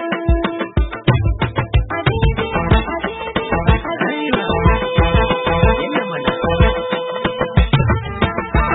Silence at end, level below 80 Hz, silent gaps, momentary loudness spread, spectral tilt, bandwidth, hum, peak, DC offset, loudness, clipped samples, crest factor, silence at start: 0 s; -22 dBFS; none; 5 LU; -12 dB/octave; 4.1 kHz; none; 0 dBFS; under 0.1%; -17 LUFS; under 0.1%; 16 dB; 0 s